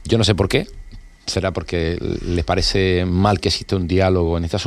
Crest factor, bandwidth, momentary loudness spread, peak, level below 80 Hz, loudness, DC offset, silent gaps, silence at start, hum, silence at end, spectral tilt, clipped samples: 18 dB; 13 kHz; 6 LU; -2 dBFS; -32 dBFS; -19 LUFS; under 0.1%; none; 0 s; none; 0 s; -5.5 dB/octave; under 0.1%